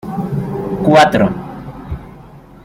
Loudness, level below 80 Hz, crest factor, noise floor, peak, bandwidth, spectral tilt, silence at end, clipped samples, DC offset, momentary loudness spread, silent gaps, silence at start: -14 LUFS; -38 dBFS; 16 dB; -38 dBFS; 0 dBFS; 15.5 kHz; -6.5 dB/octave; 0.25 s; under 0.1%; under 0.1%; 20 LU; none; 0.05 s